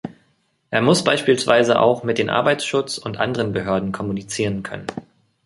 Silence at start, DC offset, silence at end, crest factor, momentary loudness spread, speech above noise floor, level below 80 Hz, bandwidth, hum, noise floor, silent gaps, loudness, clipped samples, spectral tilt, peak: 0.05 s; under 0.1%; 0.45 s; 20 dB; 13 LU; 45 dB; -52 dBFS; 11.5 kHz; none; -64 dBFS; none; -19 LUFS; under 0.1%; -4.5 dB/octave; 0 dBFS